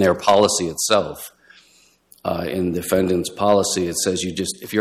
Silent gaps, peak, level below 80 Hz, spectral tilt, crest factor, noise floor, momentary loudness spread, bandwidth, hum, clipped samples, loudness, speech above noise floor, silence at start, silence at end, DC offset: none; -4 dBFS; -52 dBFS; -3.5 dB/octave; 16 dB; -56 dBFS; 12 LU; 16 kHz; none; under 0.1%; -20 LUFS; 36 dB; 0 s; 0 s; under 0.1%